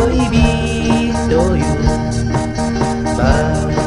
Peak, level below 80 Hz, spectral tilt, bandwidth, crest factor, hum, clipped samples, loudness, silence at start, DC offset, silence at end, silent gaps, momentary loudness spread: 0 dBFS; -22 dBFS; -6 dB/octave; 11.5 kHz; 14 dB; none; under 0.1%; -15 LUFS; 0 s; 0.9%; 0 s; none; 4 LU